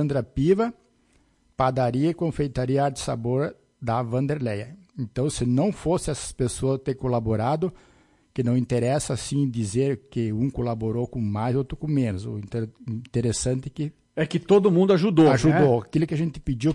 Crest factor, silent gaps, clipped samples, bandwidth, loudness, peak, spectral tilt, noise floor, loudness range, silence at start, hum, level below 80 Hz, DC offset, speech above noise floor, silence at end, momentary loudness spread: 16 dB; none; under 0.1%; 11.5 kHz; -24 LUFS; -8 dBFS; -6.5 dB/octave; -63 dBFS; 6 LU; 0 s; none; -46 dBFS; under 0.1%; 39 dB; 0 s; 13 LU